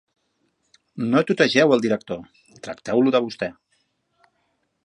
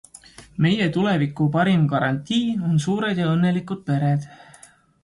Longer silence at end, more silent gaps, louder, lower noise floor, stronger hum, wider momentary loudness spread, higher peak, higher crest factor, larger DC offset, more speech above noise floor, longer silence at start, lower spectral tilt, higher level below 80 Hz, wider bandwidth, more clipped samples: first, 1.35 s vs 0.7 s; neither; about the same, -20 LUFS vs -21 LUFS; first, -71 dBFS vs -51 dBFS; neither; first, 18 LU vs 7 LU; first, -2 dBFS vs -8 dBFS; first, 22 dB vs 14 dB; neither; first, 50 dB vs 30 dB; first, 0.95 s vs 0.4 s; second, -5.5 dB/octave vs -7 dB/octave; second, -64 dBFS vs -56 dBFS; about the same, 11 kHz vs 11.5 kHz; neither